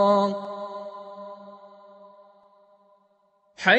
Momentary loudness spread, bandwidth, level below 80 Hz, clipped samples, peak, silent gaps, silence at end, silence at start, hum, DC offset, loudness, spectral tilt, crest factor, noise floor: 27 LU; 8.2 kHz; -78 dBFS; under 0.1%; -4 dBFS; none; 0 s; 0 s; none; under 0.1%; -28 LUFS; -5 dB/octave; 24 dB; -65 dBFS